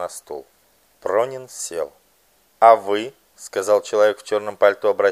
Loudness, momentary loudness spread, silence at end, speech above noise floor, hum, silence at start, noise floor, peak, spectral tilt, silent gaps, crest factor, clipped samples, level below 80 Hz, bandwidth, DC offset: -19 LUFS; 20 LU; 0 s; 41 dB; none; 0 s; -60 dBFS; 0 dBFS; -3 dB/octave; none; 20 dB; under 0.1%; -70 dBFS; 15 kHz; under 0.1%